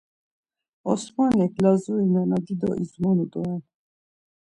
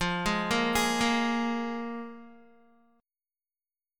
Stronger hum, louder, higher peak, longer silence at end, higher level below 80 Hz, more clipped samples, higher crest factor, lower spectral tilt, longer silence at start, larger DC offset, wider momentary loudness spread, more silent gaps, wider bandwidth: neither; first, -23 LUFS vs -28 LUFS; first, -6 dBFS vs -12 dBFS; second, 0.8 s vs 1.65 s; second, -58 dBFS vs -52 dBFS; neither; about the same, 18 dB vs 20 dB; first, -8 dB/octave vs -3.5 dB/octave; first, 0.85 s vs 0 s; neither; second, 9 LU vs 15 LU; neither; second, 10.5 kHz vs 17.5 kHz